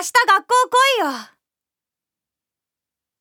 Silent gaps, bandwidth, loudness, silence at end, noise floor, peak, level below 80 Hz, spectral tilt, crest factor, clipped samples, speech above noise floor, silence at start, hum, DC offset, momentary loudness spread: none; over 20 kHz; -16 LUFS; 1.95 s; -88 dBFS; -2 dBFS; -82 dBFS; 0.5 dB/octave; 18 dB; under 0.1%; 71 dB; 0 s; none; under 0.1%; 10 LU